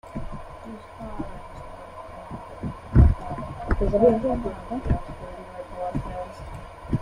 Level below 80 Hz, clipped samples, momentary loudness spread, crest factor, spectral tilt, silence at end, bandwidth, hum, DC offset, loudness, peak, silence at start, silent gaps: -30 dBFS; under 0.1%; 21 LU; 22 dB; -9.5 dB/octave; 0 s; 10 kHz; none; under 0.1%; -25 LUFS; -4 dBFS; 0.05 s; none